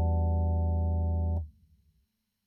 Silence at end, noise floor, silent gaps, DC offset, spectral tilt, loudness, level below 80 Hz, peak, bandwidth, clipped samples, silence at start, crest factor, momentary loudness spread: 0.95 s; -75 dBFS; none; under 0.1%; -14 dB/octave; -30 LUFS; -34 dBFS; -20 dBFS; 1 kHz; under 0.1%; 0 s; 10 dB; 7 LU